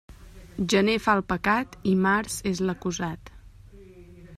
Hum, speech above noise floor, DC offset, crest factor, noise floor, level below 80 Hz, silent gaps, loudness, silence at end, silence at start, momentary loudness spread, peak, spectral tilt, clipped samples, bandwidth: none; 23 dB; under 0.1%; 20 dB; -48 dBFS; -50 dBFS; none; -25 LUFS; 0 s; 0.1 s; 10 LU; -6 dBFS; -5 dB/octave; under 0.1%; 14 kHz